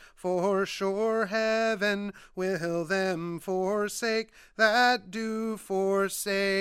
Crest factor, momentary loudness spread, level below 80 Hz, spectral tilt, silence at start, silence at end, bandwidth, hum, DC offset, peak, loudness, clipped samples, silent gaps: 18 dB; 9 LU; -64 dBFS; -4 dB/octave; 0 s; 0 s; 16 kHz; none; under 0.1%; -10 dBFS; -28 LUFS; under 0.1%; none